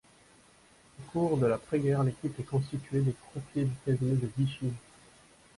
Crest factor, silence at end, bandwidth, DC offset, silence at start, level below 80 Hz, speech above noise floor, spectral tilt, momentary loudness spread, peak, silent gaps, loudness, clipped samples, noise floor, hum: 16 dB; 0.8 s; 11.5 kHz; under 0.1%; 1 s; -60 dBFS; 30 dB; -8 dB/octave; 10 LU; -16 dBFS; none; -31 LUFS; under 0.1%; -60 dBFS; none